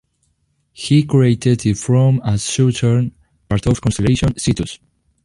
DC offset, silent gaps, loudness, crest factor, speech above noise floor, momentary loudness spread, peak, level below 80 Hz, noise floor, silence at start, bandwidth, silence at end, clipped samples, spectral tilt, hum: under 0.1%; none; -16 LUFS; 14 dB; 49 dB; 9 LU; -2 dBFS; -36 dBFS; -64 dBFS; 0.8 s; 11.5 kHz; 0.5 s; under 0.1%; -6 dB/octave; none